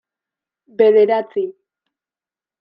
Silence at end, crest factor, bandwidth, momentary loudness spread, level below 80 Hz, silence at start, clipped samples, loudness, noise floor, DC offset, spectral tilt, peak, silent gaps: 1.1 s; 18 dB; 5 kHz; 16 LU; -76 dBFS; 0.8 s; under 0.1%; -15 LUFS; under -90 dBFS; under 0.1%; -8.5 dB/octave; -2 dBFS; none